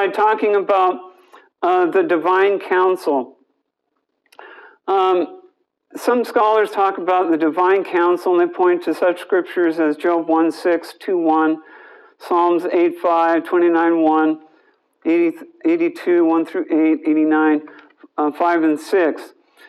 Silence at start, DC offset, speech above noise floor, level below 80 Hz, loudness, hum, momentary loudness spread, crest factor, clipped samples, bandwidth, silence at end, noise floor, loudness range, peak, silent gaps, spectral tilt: 0 s; under 0.1%; 56 dB; -80 dBFS; -17 LUFS; none; 7 LU; 14 dB; under 0.1%; 12.5 kHz; 0.4 s; -73 dBFS; 3 LU; -4 dBFS; none; -5.5 dB/octave